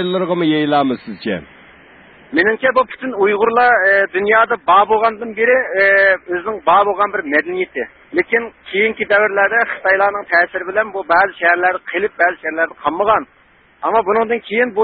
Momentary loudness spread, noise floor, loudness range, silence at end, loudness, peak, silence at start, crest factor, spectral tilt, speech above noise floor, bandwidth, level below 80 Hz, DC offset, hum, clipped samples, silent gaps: 9 LU; -44 dBFS; 4 LU; 0 s; -15 LUFS; 0 dBFS; 0 s; 14 dB; -10 dB/octave; 28 dB; 4.8 kHz; -54 dBFS; under 0.1%; none; under 0.1%; none